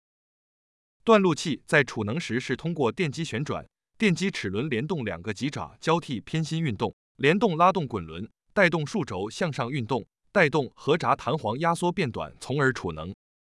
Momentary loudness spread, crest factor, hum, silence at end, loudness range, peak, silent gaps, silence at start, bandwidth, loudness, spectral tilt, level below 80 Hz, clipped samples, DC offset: 10 LU; 20 dB; none; 0.4 s; 3 LU; -6 dBFS; 6.93-7.15 s; 1.05 s; 12 kHz; -26 LUFS; -5.5 dB/octave; -60 dBFS; under 0.1%; under 0.1%